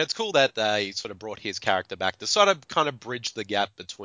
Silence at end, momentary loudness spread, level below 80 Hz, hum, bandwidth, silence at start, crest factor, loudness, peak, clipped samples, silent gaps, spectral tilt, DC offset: 0 s; 11 LU; -64 dBFS; none; 7.8 kHz; 0 s; 22 dB; -25 LUFS; -4 dBFS; under 0.1%; none; -2.5 dB/octave; under 0.1%